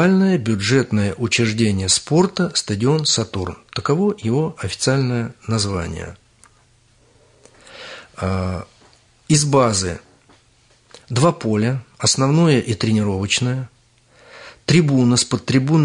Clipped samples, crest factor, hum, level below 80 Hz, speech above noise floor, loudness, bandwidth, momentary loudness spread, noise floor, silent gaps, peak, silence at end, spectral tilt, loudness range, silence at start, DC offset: under 0.1%; 16 dB; none; -52 dBFS; 38 dB; -18 LUFS; 11 kHz; 12 LU; -55 dBFS; none; -2 dBFS; 0 s; -5 dB/octave; 9 LU; 0 s; under 0.1%